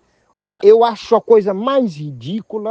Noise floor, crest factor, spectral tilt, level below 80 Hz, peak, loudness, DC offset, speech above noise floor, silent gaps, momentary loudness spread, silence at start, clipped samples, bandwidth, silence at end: -62 dBFS; 16 dB; -7 dB/octave; -64 dBFS; 0 dBFS; -14 LUFS; under 0.1%; 48 dB; none; 14 LU; 0.6 s; under 0.1%; 7.2 kHz; 0 s